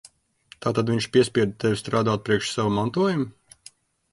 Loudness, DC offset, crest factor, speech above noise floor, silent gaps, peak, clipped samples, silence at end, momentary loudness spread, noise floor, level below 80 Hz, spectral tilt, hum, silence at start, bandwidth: -24 LUFS; under 0.1%; 18 dB; 32 dB; none; -6 dBFS; under 0.1%; 0.85 s; 6 LU; -54 dBFS; -56 dBFS; -5.5 dB/octave; none; 0.6 s; 11.5 kHz